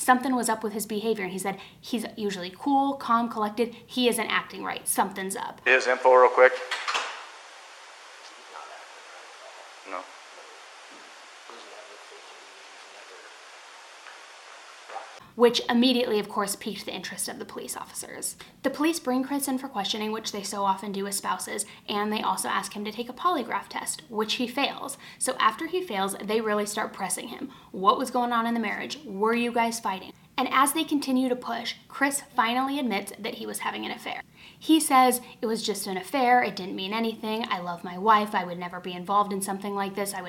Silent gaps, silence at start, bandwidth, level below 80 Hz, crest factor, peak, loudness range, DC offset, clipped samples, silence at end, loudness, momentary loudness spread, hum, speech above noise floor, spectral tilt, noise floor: none; 0 s; 17.5 kHz; -70 dBFS; 24 dB; -2 dBFS; 19 LU; under 0.1%; under 0.1%; 0 s; -26 LUFS; 23 LU; none; 21 dB; -3 dB/octave; -47 dBFS